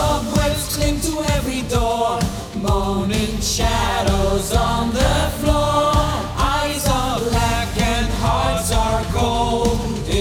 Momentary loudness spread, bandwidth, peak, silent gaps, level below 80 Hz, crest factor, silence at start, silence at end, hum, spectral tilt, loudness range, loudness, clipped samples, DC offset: 3 LU; 19.5 kHz; -2 dBFS; none; -24 dBFS; 16 dB; 0 s; 0 s; none; -4.5 dB/octave; 2 LU; -19 LUFS; under 0.1%; under 0.1%